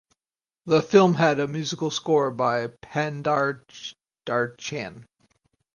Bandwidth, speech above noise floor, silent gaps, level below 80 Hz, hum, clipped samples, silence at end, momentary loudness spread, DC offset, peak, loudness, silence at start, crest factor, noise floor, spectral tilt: 10 kHz; over 67 dB; none; -66 dBFS; none; under 0.1%; 0.7 s; 19 LU; under 0.1%; -4 dBFS; -24 LUFS; 0.65 s; 20 dB; under -90 dBFS; -5.5 dB/octave